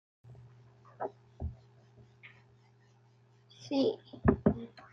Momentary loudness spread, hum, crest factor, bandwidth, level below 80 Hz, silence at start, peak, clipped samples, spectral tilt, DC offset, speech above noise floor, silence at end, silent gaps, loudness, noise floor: 26 LU; none; 26 dB; 7.2 kHz; -52 dBFS; 0.25 s; -10 dBFS; under 0.1%; -8 dB/octave; under 0.1%; 32 dB; 0.1 s; none; -34 LUFS; -64 dBFS